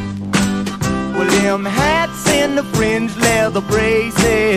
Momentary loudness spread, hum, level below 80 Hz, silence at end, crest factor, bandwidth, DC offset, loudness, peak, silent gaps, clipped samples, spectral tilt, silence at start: 5 LU; none; -34 dBFS; 0 s; 16 dB; 15.5 kHz; under 0.1%; -15 LUFS; 0 dBFS; none; under 0.1%; -4.5 dB/octave; 0 s